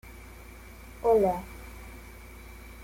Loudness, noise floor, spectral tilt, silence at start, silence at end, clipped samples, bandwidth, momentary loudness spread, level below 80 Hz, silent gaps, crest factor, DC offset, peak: -26 LUFS; -47 dBFS; -6.5 dB/octave; 0.05 s; 0 s; under 0.1%; 16.5 kHz; 24 LU; -48 dBFS; none; 18 dB; under 0.1%; -14 dBFS